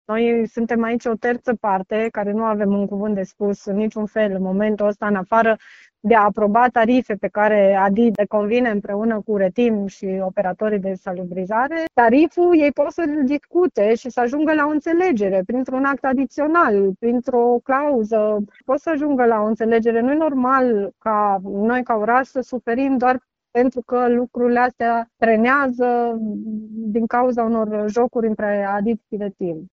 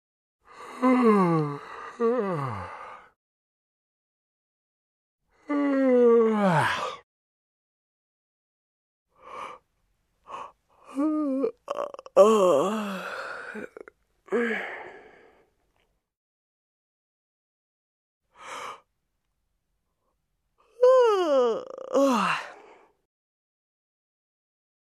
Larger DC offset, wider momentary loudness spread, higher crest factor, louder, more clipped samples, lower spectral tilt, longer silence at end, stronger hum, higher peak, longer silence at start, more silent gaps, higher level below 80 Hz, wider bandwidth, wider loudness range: neither; second, 8 LU vs 22 LU; second, 18 dB vs 24 dB; first, -19 LUFS vs -24 LUFS; neither; about the same, -5.5 dB/octave vs -6 dB/octave; second, 0.1 s vs 2.35 s; neither; about the same, -2 dBFS vs -4 dBFS; second, 0.1 s vs 0.55 s; second, none vs 3.16-5.19 s, 7.03-9.06 s, 16.17-18.20 s; first, -56 dBFS vs -74 dBFS; second, 7.4 kHz vs 13.5 kHz; second, 4 LU vs 22 LU